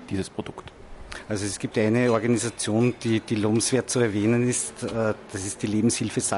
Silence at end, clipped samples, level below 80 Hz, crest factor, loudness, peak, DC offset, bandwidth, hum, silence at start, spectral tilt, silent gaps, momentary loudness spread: 0 s; under 0.1%; -50 dBFS; 18 dB; -24 LUFS; -8 dBFS; under 0.1%; 11.5 kHz; none; 0 s; -5 dB/octave; none; 11 LU